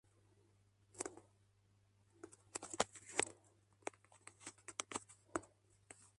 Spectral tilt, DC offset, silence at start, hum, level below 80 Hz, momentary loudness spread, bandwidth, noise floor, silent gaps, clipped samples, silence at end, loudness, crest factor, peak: -1.5 dB/octave; under 0.1%; 0.95 s; none; -78 dBFS; 21 LU; 11.5 kHz; -75 dBFS; none; under 0.1%; 0.1 s; -46 LUFS; 34 dB; -16 dBFS